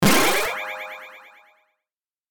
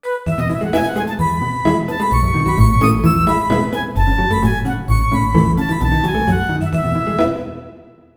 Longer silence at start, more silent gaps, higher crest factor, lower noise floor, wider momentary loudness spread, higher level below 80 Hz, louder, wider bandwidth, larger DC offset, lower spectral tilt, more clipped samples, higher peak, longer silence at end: about the same, 0 s vs 0.05 s; first, 2.20-2.24 s vs none; about the same, 20 dB vs 16 dB; first, -90 dBFS vs -41 dBFS; first, 21 LU vs 6 LU; second, -48 dBFS vs -24 dBFS; second, -21 LUFS vs -17 LUFS; about the same, over 20 kHz vs over 20 kHz; neither; second, -3 dB/octave vs -7 dB/octave; neither; second, -4 dBFS vs 0 dBFS; second, 0 s vs 0.35 s